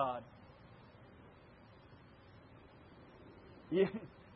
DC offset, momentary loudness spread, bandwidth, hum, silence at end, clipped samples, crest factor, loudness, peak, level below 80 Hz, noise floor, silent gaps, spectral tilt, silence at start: under 0.1%; 25 LU; 5.6 kHz; none; 0 s; under 0.1%; 22 dB; -38 LUFS; -20 dBFS; -70 dBFS; -60 dBFS; none; -5.5 dB/octave; 0 s